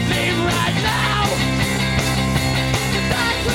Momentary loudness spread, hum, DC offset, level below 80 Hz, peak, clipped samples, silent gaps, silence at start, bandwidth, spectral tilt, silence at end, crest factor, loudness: 1 LU; none; under 0.1%; -32 dBFS; -4 dBFS; under 0.1%; none; 0 s; 16.5 kHz; -4.5 dB/octave; 0 s; 14 dB; -18 LUFS